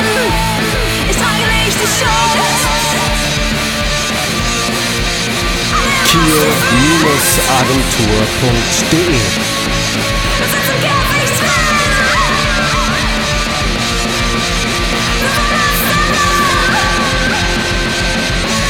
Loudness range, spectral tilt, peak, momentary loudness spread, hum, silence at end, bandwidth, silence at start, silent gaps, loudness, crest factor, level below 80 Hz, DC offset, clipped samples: 3 LU; -3 dB/octave; 0 dBFS; 4 LU; none; 0 s; over 20 kHz; 0 s; none; -12 LUFS; 12 dB; -22 dBFS; under 0.1%; under 0.1%